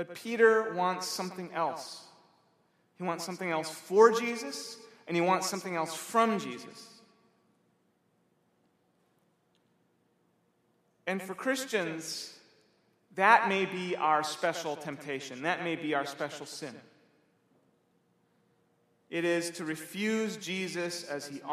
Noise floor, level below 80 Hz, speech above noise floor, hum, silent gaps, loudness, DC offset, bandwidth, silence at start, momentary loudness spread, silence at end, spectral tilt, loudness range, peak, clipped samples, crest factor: -72 dBFS; -86 dBFS; 42 dB; none; none; -31 LUFS; under 0.1%; 15.5 kHz; 0 s; 17 LU; 0 s; -4 dB/octave; 10 LU; -8 dBFS; under 0.1%; 26 dB